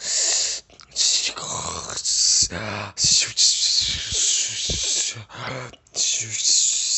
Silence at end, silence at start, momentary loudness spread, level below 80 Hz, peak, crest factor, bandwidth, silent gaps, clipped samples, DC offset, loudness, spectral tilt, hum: 0 s; 0 s; 15 LU; -48 dBFS; -4 dBFS; 18 dB; 8.6 kHz; none; under 0.1%; under 0.1%; -19 LUFS; 0.5 dB/octave; none